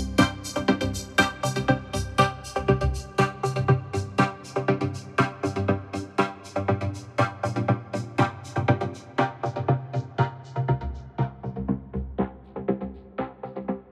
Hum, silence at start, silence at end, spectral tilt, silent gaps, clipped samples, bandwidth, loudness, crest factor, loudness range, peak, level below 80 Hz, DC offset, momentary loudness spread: none; 0 s; 0 s; -6 dB/octave; none; under 0.1%; 13.5 kHz; -27 LUFS; 22 dB; 5 LU; -4 dBFS; -42 dBFS; under 0.1%; 8 LU